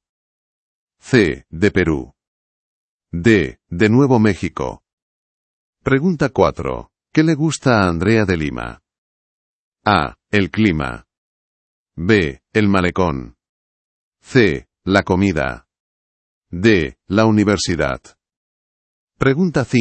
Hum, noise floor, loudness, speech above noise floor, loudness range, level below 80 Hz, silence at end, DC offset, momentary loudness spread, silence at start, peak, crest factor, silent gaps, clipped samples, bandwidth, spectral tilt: none; under -90 dBFS; -17 LUFS; over 74 dB; 3 LU; -42 dBFS; 0 s; under 0.1%; 12 LU; 1.05 s; 0 dBFS; 18 dB; 2.27-3.00 s, 4.93-5.73 s, 8.98-9.72 s, 11.17-11.86 s, 13.49-14.12 s, 15.80-16.42 s, 18.36-19.07 s; under 0.1%; 8.8 kHz; -6.5 dB/octave